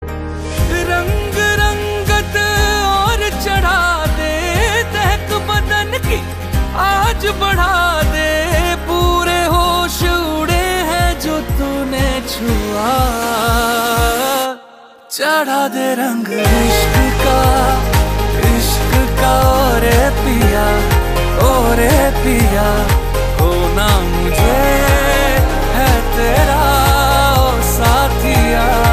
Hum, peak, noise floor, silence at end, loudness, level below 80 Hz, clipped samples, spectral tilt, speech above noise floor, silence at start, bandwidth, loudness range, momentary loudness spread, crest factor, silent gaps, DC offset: none; 0 dBFS; -40 dBFS; 0 s; -14 LUFS; -18 dBFS; under 0.1%; -4.5 dB/octave; 27 dB; 0 s; 15.5 kHz; 3 LU; 6 LU; 12 dB; none; under 0.1%